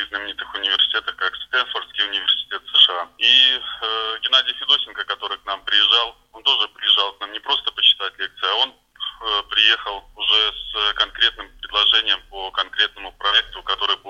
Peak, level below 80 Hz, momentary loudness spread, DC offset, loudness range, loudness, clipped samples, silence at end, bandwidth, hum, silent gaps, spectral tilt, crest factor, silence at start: 0 dBFS; -52 dBFS; 12 LU; under 0.1%; 3 LU; -18 LUFS; under 0.1%; 0 s; 10 kHz; none; none; 0 dB/octave; 20 dB; 0 s